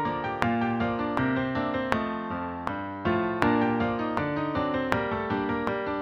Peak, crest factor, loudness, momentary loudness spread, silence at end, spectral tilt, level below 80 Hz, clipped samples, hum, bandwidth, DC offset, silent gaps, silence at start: -2 dBFS; 26 dB; -28 LUFS; 7 LU; 0 s; -7.5 dB/octave; -50 dBFS; under 0.1%; none; 9.4 kHz; under 0.1%; none; 0 s